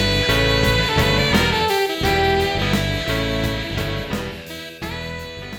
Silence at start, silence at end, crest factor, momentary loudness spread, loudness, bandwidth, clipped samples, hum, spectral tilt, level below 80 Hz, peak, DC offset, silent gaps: 0 s; 0 s; 16 dB; 13 LU; -19 LUFS; 19.5 kHz; under 0.1%; none; -4.5 dB/octave; -30 dBFS; -2 dBFS; under 0.1%; none